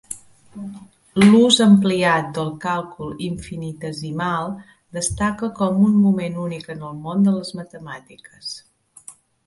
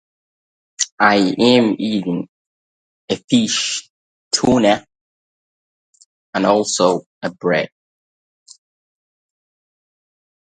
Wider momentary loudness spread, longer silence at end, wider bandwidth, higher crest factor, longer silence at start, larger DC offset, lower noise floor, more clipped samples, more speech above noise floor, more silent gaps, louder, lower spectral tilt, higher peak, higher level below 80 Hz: first, 22 LU vs 12 LU; second, 0.35 s vs 2.75 s; first, 11.5 kHz vs 9.6 kHz; about the same, 20 dB vs 20 dB; second, 0.1 s vs 0.8 s; neither; second, -45 dBFS vs under -90 dBFS; neither; second, 26 dB vs over 74 dB; second, none vs 0.92-0.98 s, 2.29-3.08 s, 3.24-3.28 s, 3.90-4.31 s, 5.01-5.93 s, 6.06-6.33 s, 7.06-7.21 s; about the same, -19 LUFS vs -17 LUFS; first, -5 dB/octave vs -3.5 dB/octave; about the same, 0 dBFS vs 0 dBFS; first, -50 dBFS vs -56 dBFS